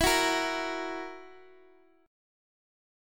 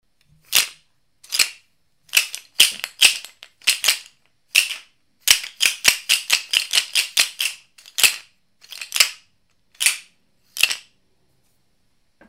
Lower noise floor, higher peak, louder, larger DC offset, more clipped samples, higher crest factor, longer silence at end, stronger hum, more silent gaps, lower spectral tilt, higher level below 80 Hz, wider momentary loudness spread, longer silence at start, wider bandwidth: second, -61 dBFS vs -67 dBFS; second, -12 dBFS vs 0 dBFS; second, -30 LUFS vs -18 LUFS; neither; neither; about the same, 20 dB vs 22 dB; first, 1.65 s vs 1.5 s; neither; neither; first, -2 dB/octave vs 3.5 dB/octave; first, -50 dBFS vs -62 dBFS; first, 18 LU vs 14 LU; second, 0 s vs 0.5 s; about the same, 17.5 kHz vs 16.5 kHz